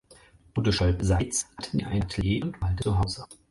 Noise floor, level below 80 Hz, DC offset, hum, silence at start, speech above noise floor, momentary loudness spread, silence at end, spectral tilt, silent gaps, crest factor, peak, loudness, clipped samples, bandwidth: -55 dBFS; -36 dBFS; under 0.1%; none; 0.55 s; 29 dB; 7 LU; 0.15 s; -5 dB/octave; none; 16 dB; -12 dBFS; -27 LUFS; under 0.1%; 11.5 kHz